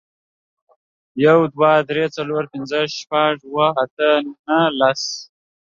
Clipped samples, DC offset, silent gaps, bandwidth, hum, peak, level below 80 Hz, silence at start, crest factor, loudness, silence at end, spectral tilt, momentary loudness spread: under 0.1%; under 0.1%; 3.91-3.97 s, 4.39-4.44 s; 7.4 kHz; none; -2 dBFS; -66 dBFS; 1.15 s; 18 dB; -18 LUFS; 0.35 s; -5 dB/octave; 9 LU